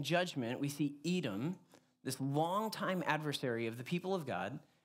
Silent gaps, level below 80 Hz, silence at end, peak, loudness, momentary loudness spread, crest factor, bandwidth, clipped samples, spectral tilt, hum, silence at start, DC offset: none; -88 dBFS; 0.25 s; -18 dBFS; -38 LUFS; 7 LU; 20 dB; 16 kHz; under 0.1%; -5.5 dB/octave; none; 0 s; under 0.1%